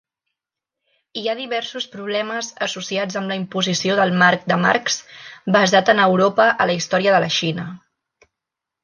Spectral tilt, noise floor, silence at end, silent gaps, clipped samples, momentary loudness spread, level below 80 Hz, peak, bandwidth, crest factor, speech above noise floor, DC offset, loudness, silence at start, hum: -4 dB/octave; -85 dBFS; 1.05 s; none; under 0.1%; 12 LU; -66 dBFS; -2 dBFS; 10 kHz; 18 dB; 66 dB; under 0.1%; -18 LUFS; 1.15 s; none